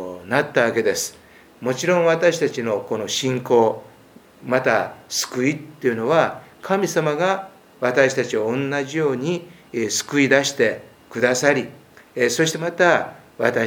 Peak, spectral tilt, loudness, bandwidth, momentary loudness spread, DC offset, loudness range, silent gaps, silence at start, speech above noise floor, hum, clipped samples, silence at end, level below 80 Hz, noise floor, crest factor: 0 dBFS; -4 dB/octave; -20 LUFS; 20 kHz; 11 LU; under 0.1%; 2 LU; none; 0 s; 29 dB; none; under 0.1%; 0 s; -66 dBFS; -48 dBFS; 20 dB